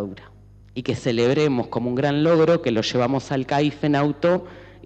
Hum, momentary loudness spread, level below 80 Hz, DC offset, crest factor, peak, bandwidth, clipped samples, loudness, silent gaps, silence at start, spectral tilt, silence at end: none; 10 LU; -52 dBFS; under 0.1%; 14 dB; -8 dBFS; 8.6 kHz; under 0.1%; -21 LUFS; none; 0 s; -6.5 dB/octave; 0.15 s